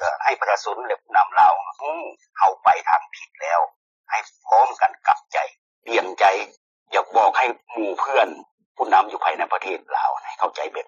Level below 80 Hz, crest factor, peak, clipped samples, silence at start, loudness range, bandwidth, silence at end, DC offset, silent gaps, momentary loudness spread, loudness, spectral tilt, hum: -72 dBFS; 16 dB; -4 dBFS; under 0.1%; 0 s; 2 LU; 7.4 kHz; 0.05 s; under 0.1%; 3.76-4.04 s, 5.58-5.82 s, 6.57-6.86 s, 8.51-8.58 s, 8.66-8.75 s; 11 LU; -21 LUFS; 1.5 dB/octave; none